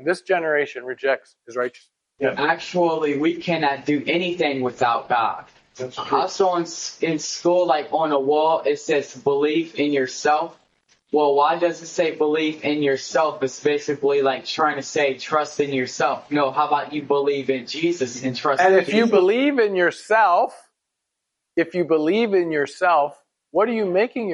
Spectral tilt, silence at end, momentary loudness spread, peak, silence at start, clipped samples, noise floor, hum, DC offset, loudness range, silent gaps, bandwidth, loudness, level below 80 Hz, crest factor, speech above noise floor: -4.5 dB/octave; 0 s; 7 LU; -4 dBFS; 0 s; under 0.1%; -80 dBFS; none; under 0.1%; 4 LU; none; 10.5 kHz; -21 LUFS; -70 dBFS; 16 dB; 60 dB